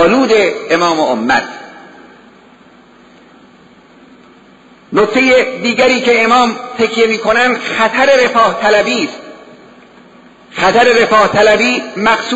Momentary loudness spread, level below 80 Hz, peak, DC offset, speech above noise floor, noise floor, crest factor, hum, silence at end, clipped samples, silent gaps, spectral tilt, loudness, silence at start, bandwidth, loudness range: 7 LU; -48 dBFS; 0 dBFS; under 0.1%; 32 dB; -42 dBFS; 12 dB; none; 0 s; under 0.1%; none; -3.5 dB/octave; -11 LUFS; 0 s; 8 kHz; 8 LU